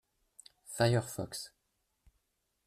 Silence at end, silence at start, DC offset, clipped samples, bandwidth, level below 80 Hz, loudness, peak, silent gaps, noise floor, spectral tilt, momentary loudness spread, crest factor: 1.2 s; 0.65 s; under 0.1%; under 0.1%; 14.5 kHz; -66 dBFS; -34 LUFS; -14 dBFS; none; -81 dBFS; -5 dB/octave; 19 LU; 22 dB